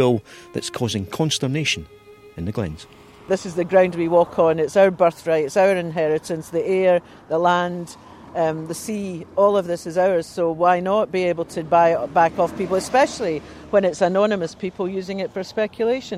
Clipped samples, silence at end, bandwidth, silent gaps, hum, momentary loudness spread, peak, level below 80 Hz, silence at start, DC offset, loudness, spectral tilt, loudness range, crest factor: under 0.1%; 0 s; 15 kHz; none; none; 11 LU; -4 dBFS; -54 dBFS; 0 s; under 0.1%; -20 LUFS; -5 dB/octave; 4 LU; 16 dB